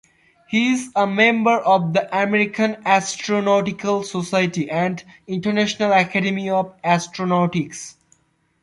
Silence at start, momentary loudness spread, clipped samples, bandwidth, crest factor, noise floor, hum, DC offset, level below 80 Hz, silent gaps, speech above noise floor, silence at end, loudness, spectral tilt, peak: 0.5 s; 8 LU; under 0.1%; 11.5 kHz; 18 dB; -61 dBFS; none; under 0.1%; -62 dBFS; none; 41 dB; 0.7 s; -19 LUFS; -5 dB/octave; -2 dBFS